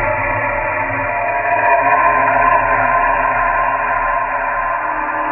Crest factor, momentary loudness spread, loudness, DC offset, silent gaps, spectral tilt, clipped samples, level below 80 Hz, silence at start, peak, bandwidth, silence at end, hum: 14 dB; 6 LU; -15 LUFS; under 0.1%; none; -9 dB/octave; under 0.1%; -36 dBFS; 0 s; 0 dBFS; 3.3 kHz; 0 s; none